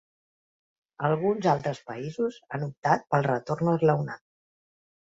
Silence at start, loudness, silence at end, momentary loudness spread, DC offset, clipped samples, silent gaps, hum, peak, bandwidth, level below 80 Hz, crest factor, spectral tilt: 1 s; -27 LUFS; 0.85 s; 11 LU; under 0.1%; under 0.1%; 2.77-2.83 s; none; -8 dBFS; 7.8 kHz; -64 dBFS; 20 dB; -7.5 dB/octave